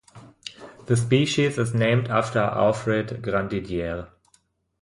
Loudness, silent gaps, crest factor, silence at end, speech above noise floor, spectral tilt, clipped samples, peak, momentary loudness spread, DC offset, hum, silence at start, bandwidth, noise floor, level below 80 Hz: -23 LUFS; none; 18 dB; 0.75 s; 42 dB; -6 dB/octave; under 0.1%; -6 dBFS; 19 LU; under 0.1%; none; 0.15 s; 11.5 kHz; -65 dBFS; -50 dBFS